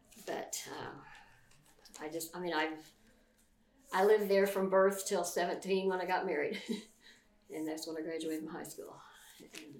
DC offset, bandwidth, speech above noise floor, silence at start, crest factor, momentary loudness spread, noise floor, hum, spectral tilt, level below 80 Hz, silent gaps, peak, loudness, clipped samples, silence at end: under 0.1%; 18 kHz; 35 dB; 0.15 s; 20 dB; 22 LU; -69 dBFS; none; -4 dB/octave; -74 dBFS; none; -18 dBFS; -35 LUFS; under 0.1%; 0 s